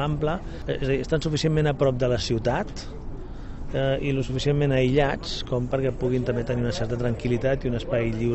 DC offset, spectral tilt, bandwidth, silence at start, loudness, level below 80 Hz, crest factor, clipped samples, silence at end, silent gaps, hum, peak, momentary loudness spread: under 0.1%; -6.5 dB/octave; 8.4 kHz; 0 s; -25 LUFS; -36 dBFS; 16 dB; under 0.1%; 0 s; none; none; -10 dBFS; 10 LU